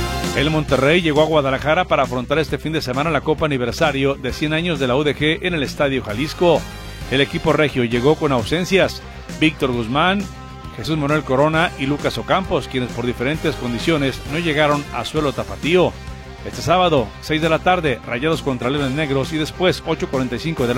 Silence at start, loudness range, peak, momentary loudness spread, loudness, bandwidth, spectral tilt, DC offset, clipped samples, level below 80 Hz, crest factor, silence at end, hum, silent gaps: 0 s; 2 LU; -2 dBFS; 7 LU; -19 LUFS; 16.5 kHz; -5.5 dB/octave; under 0.1%; under 0.1%; -36 dBFS; 16 dB; 0 s; none; none